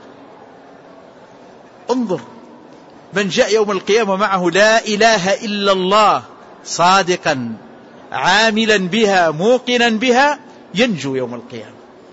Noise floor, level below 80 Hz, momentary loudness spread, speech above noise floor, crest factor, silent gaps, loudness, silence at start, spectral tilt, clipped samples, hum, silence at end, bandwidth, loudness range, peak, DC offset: -41 dBFS; -56 dBFS; 14 LU; 27 dB; 14 dB; none; -15 LUFS; 0.05 s; -3.5 dB/octave; under 0.1%; none; 0.4 s; 8 kHz; 7 LU; -2 dBFS; under 0.1%